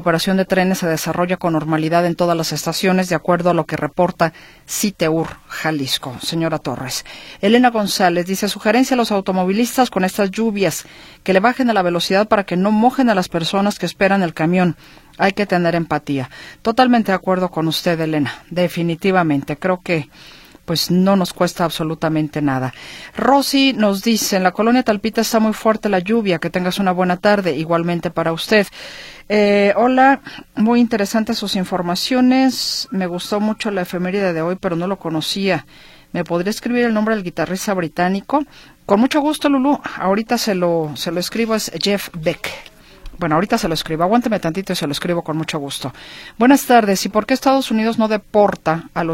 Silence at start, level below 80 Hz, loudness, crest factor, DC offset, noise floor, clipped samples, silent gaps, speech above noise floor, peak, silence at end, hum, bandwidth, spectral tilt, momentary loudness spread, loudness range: 0 s; -48 dBFS; -17 LUFS; 18 dB; under 0.1%; -36 dBFS; under 0.1%; none; 19 dB; 0 dBFS; 0 s; none; 16.5 kHz; -5 dB/octave; 8 LU; 4 LU